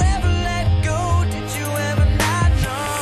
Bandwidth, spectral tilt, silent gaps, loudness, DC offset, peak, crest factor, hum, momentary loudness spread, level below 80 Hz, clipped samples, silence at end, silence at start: 13 kHz; -5 dB/octave; none; -19 LUFS; under 0.1%; -6 dBFS; 12 dB; none; 5 LU; -24 dBFS; under 0.1%; 0 s; 0 s